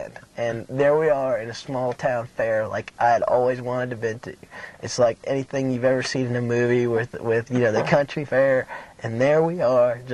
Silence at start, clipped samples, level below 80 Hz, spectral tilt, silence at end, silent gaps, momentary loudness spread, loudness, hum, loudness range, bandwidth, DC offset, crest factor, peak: 0 s; under 0.1%; -58 dBFS; -6 dB/octave; 0 s; none; 11 LU; -22 LUFS; none; 3 LU; 11.5 kHz; under 0.1%; 16 dB; -6 dBFS